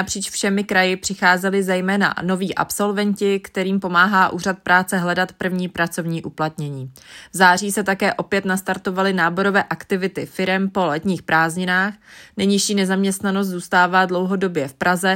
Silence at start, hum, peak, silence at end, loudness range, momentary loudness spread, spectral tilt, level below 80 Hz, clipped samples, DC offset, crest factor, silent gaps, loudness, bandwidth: 0 s; none; 0 dBFS; 0 s; 2 LU; 8 LU; -4.5 dB/octave; -58 dBFS; under 0.1%; under 0.1%; 18 dB; none; -19 LUFS; 16.5 kHz